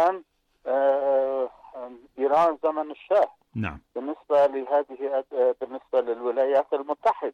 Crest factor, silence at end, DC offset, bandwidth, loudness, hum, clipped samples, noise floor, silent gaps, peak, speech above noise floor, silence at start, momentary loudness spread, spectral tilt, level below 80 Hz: 12 dB; 0.05 s; under 0.1%; 6.8 kHz; -25 LUFS; none; under 0.1%; -49 dBFS; none; -12 dBFS; 24 dB; 0 s; 12 LU; -7 dB/octave; -60 dBFS